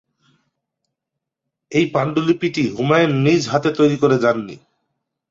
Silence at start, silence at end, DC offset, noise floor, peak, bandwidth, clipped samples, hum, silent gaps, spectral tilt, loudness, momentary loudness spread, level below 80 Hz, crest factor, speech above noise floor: 1.7 s; 0.75 s; under 0.1%; -82 dBFS; -2 dBFS; 7.8 kHz; under 0.1%; none; none; -6.5 dB/octave; -17 LUFS; 5 LU; -58 dBFS; 18 dB; 65 dB